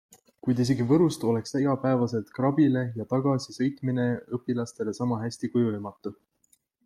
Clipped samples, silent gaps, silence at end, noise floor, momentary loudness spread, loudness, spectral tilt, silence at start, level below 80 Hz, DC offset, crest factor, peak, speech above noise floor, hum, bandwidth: under 0.1%; none; 0.75 s; -68 dBFS; 9 LU; -27 LUFS; -7.5 dB/octave; 0.45 s; -66 dBFS; under 0.1%; 16 dB; -12 dBFS; 42 dB; none; 13 kHz